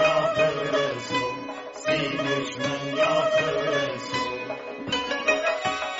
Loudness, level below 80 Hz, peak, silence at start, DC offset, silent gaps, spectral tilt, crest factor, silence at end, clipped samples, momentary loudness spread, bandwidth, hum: -25 LUFS; -60 dBFS; -8 dBFS; 0 s; under 0.1%; none; -2 dB/octave; 16 dB; 0 s; under 0.1%; 9 LU; 8 kHz; none